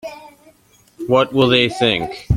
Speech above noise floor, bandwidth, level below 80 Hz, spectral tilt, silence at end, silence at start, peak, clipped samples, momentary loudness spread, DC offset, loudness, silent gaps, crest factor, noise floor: 37 dB; 15.5 kHz; -36 dBFS; -6 dB/octave; 0 s; 0.05 s; 0 dBFS; under 0.1%; 15 LU; under 0.1%; -15 LUFS; none; 18 dB; -53 dBFS